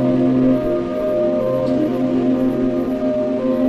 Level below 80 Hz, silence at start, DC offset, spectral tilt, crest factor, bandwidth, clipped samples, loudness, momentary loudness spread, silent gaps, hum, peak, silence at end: -42 dBFS; 0 s; under 0.1%; -9 dB/octave; 12 dB; 6.2 kHz; under 0.1%; -18 LUFS; 4 LU; none; none; -6 dBFS; 0 s